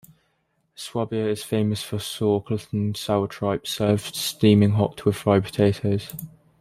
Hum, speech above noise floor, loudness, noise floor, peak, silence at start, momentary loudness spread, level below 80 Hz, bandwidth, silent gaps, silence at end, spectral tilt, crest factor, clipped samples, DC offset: none; 48 dB; -23 LUFS; -70 dBFS; -4 dBFS; 0.8 s; 11 LU; -56 dBFS; 15.5 kHz; none; 0.35 s; -6 dB/octave; 18 dB; under 0.1%; under 0.1%